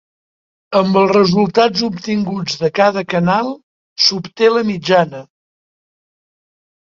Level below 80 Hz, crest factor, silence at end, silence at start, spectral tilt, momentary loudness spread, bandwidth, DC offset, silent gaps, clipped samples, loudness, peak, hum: -56 dBFS; 16 dB; 1.7 s; 0.7 s; -5 dB/octave; 9 LU; 7.6 kHz; under 0.1%; 3.63-3.96 s; under 0.1%; -15 LUFS; 0 dBFS; none